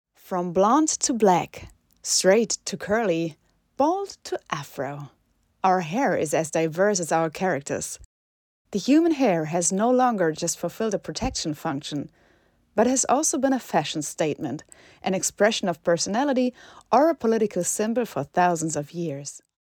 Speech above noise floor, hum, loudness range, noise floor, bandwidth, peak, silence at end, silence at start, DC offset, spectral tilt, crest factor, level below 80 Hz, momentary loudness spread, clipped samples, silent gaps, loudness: 39 dB; none; 3 LU; -62 dBFS; 19.5 kHz; -6 dBFS; 0.25 s; 0.25 s; under 0.1%; -4 dB/octave; 18 dB; -56 dBFS; 13 LU; under 0.1%; 8.05-8.65 s; -24 LUFS